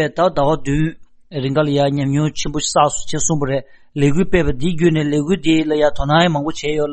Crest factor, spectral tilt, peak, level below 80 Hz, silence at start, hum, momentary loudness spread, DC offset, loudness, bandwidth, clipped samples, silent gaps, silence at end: 14 dB; -5 dB/octave; -2 dBFS; -34 dBFS; 0 s; none; 6 LU; under 0.1%; -17 LUFS; 8.8 kHz; under 0.1%; none; 0 s